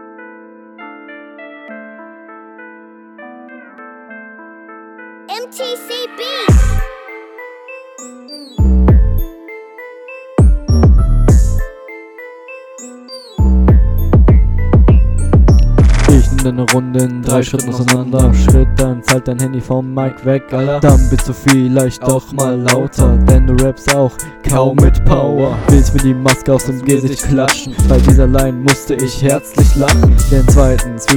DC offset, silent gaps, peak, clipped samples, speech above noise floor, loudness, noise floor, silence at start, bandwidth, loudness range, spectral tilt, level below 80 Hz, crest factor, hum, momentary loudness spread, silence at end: under 0.1%; none; 0 dBFS; 0.2%; 27 dB; -12 LUFS; -37 dBFS; 0 s; 17.5 kHz; 13 LU; -6 dB/octave; -14 dBFS; 12 dB; none; 22 LU; 0 s